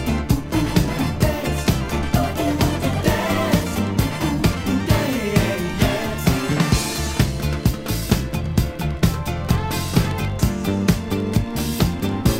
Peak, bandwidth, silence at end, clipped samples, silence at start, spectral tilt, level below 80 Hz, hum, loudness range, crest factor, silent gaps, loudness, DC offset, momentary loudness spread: 0 dBFS; 16.5 kHz; 0 s; under 0.1%; 0 s; -5.5 dB/octave; -28 dBFS; none; 1 LU; 20 dB; none; -21 LUFS; under 0.1%; 3 LU